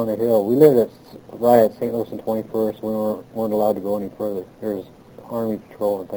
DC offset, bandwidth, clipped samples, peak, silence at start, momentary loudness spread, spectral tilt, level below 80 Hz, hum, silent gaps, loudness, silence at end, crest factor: under 0.1%; over 20 kHz; under 0.1%; -2 dBFS; 0 s; 14 LU; -8 dB/octave; -58 dBFS; none; none; -20 LUFS; 0 s; 20 dB